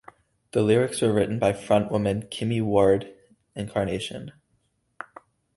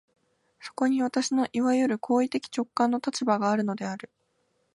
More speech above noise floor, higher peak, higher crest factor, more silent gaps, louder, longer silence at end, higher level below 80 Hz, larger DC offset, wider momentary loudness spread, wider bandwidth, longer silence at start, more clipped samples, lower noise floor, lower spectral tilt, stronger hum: about the same, 47 dB vs 46 dB; first, -6 dBFS vs -10 dBFS; about the same, 20 dB vs 18 dB; neither; first, -24 LUFS vs -27 LUFS; first, 1.25 s vs 0.75 s; first, -52 dBFS vs -76 dBFS; neither; first, 21 LU vs 10 LU; about the same, 11.5 kHz vs 11.5 kHz; about the same, 0.55 s vs 0.6 s; neither; about the same, -70 dBFS vs -72 dBFS; first, -6 dB/octave vs -4.5 dB/octave; neither